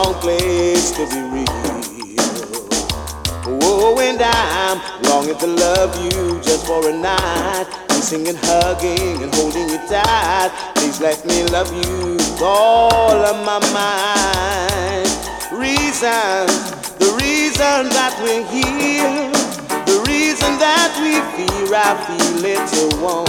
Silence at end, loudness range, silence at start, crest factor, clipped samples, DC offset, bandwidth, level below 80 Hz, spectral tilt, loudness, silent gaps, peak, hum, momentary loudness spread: 0 s; 2 LU; 0 s; 16 dB; under 0.1%; under 0.1%; 20 kHz; -34 dBFS; -3 dB/octave; -16 LUFS; none; 0 dBFS; none; 7 LU